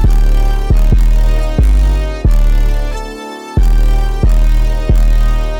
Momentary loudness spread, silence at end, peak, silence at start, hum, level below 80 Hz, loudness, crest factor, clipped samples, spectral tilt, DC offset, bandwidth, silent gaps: 7 LU; 0 s; -2 dBFS; 0 s; none; -10 dBFS; -14 LUFS; 6 dB; under 0.1%; -7 dB/octave; under 0.1%; 8 kHz; none